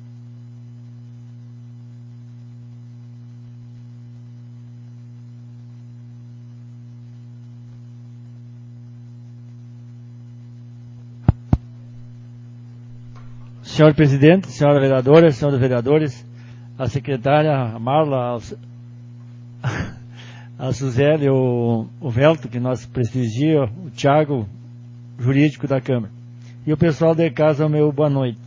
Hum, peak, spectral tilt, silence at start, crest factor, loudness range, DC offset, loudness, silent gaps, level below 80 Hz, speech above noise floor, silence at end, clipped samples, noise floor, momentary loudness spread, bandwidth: 60 Hz at -40 dBFS; 0 dBFS; -8 dB/octave; 0 s; 20 dB; 24 LU; under 0.1%; -18 LUFS; none; -42 dBFS; 21 dB; 0 s; under 0.1%; -38 dBFS; 24 LU; 7.6 kHz